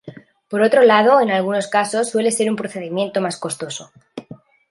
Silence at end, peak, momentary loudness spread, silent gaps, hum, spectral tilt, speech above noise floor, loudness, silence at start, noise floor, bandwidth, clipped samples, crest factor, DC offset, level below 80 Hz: 0.35 s; -2 dBFS; 20 LU; none; none; -4 dB/octave; 25 dB; -17 LUFS; 0.05 s; -42 dBFS; 11.5 kHz; under 0.1%; 16 dB; under 0.1%; -68 dBFS